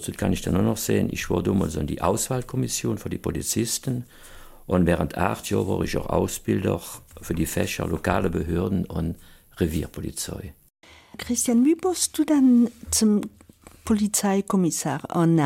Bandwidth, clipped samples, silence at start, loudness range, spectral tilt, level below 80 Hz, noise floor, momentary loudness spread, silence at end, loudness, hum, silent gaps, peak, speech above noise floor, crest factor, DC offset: 16.5 kHz; under 0.1%; 0 s; 5 LU; -5 dB/octave; -42 dBFS; -44 dBFS; 12 LU; 0 s; -24 LUFS; none; none; -6 dBFS; 20 dB; 18 dB; under 0.1%